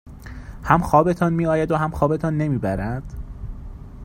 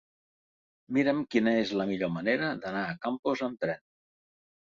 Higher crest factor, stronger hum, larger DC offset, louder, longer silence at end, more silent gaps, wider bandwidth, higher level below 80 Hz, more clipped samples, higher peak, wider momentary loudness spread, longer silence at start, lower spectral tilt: about the same, 22 dB vs 18 dB; neither; neither; first, -20 LUFS vs -30 LUFS; second, 0 s vs 0.9 s; second, none vs 3.19-3.23 s; first, 16 kHz vs 7.4 kHz; first, -36 dBFS vs -68 dBFS; neither; first, 0 dBFS vs -12 dBFS; first, 22 LU vs 7 LU; second, 0.05 s vs 0.9 s; first, -8.5 dB/octave vs -6.5 dB/octave